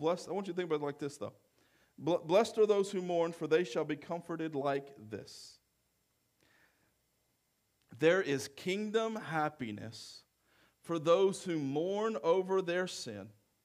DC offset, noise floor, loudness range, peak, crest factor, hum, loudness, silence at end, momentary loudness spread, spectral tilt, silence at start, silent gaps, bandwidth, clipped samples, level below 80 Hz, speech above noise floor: under 0.1%; -78 dBFS; 9 LU; -16 dBFS; 20 dB; none; -34 LUFS; 0.35 s; 17 LU; -5 dB/octave; 0 s; none; 15 kHz; under 0.1%; -82 dBFS; 45 dB